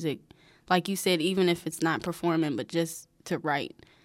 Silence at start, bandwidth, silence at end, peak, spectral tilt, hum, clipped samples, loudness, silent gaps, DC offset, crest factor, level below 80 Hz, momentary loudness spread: 0 s; 16 kHz; 0.35 s; -12 dBFS; -4.5 dB/octave; none; under 0.1%; -28 LUFS; none; under 0.1%; 18 dB; -66 dBFS; 9 LU